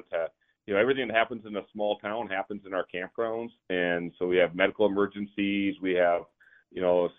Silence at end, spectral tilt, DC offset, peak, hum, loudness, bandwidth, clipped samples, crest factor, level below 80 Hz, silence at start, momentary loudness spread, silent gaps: 0.05 s; -9 dB/octave; under 0.1%; -8 dBFS; none; -29 LUFS; 3.9 kHz; under 0.1%; 22 dB; -66 dBFS; 0.1 s; 9 LU; none